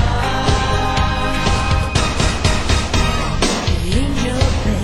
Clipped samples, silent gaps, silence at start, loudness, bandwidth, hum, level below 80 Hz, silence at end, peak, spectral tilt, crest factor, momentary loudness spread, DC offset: under 0.1%; none; 0 s; -17 LUFS; 16 kHz; none; -20 dBFS; 0 s; -2 dBFS; -4.5 dB/octave; 14 dB; 2 LU; under 0.1%